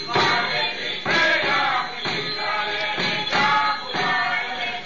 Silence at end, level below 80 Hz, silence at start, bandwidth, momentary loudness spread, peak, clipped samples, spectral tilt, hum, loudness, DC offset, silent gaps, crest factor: 0 s; -58 dBFS; 0 s; 7.4 kHz; 6 LU; -10 dBFS; under 0.1%; -3 dB/octave; none; -21 LUFS; 0.9%; none; 14 dB